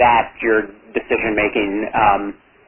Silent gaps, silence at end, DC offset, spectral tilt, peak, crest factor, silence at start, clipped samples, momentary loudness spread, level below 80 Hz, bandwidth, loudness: none; 0.35 s; under 0.1%; -9 dB/octave; -2 dBFS; 16 dB; 0 s; under 0.1%; 9 LU; -44 dBFS; 3.5 kHz; -18 LUFS